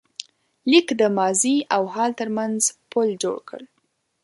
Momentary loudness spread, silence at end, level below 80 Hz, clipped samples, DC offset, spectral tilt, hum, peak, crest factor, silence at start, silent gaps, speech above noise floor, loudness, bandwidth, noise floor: 18 LU; 0.6 s; -72 dBFS; under 0.1%; under 0.1%; -3 dB/octave; none; -2 dBFS; 20 dB; 0.65 s; none; 50 dB; -21 LUFS; 11.5 kHz; -71 dBFS